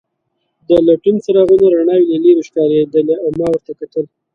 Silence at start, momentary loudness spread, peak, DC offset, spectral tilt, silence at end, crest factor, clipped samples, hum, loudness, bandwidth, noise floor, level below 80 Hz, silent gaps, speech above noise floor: 0.7 s; 11 LU; 0 dBFS; under 0.1%; -8 dB/octave; 0.3 s; 12 dB; under 0.1%; none; -13 LUFS; 7 kHz; -69 dBFS; -50 dBFS; none; 57 dB